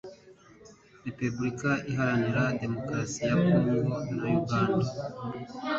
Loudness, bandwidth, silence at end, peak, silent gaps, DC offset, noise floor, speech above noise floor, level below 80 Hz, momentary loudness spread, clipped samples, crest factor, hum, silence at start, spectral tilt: -29 LUFS; 8 kHz; 0 s; -12 dBFS; none; under 0.1%; -54 dBFS; 26 dB; -58 dBFS; 13 LU; under 0.1%; 18 dB; none; 0.05 s; -6.5 dB/octave